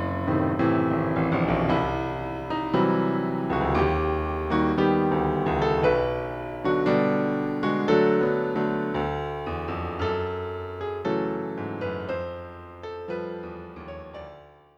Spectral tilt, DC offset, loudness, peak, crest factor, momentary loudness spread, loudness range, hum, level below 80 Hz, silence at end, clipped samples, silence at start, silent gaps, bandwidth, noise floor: -8.5 dB/octave; under 0.1%; -25 LUFS; -8 dBFS; 18 dB; 15 LU; 8 LU; none; -42 dBFS; 0.3 s; under 0.1%; 0 s; none; 7.4 kHz; -48 dBFS